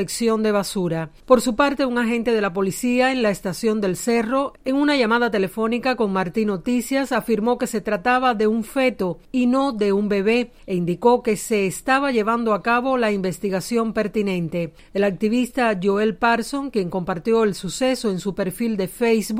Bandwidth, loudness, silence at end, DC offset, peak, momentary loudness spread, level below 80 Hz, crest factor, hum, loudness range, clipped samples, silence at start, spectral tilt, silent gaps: 16 kHz; -21 LUFS; 0 s; under 0.1%; 0 dBFS; 6 LU; -48 dBFS; 20 dB; none; 2 LU; under 0.1%; 0 s; -5 dB/octave; none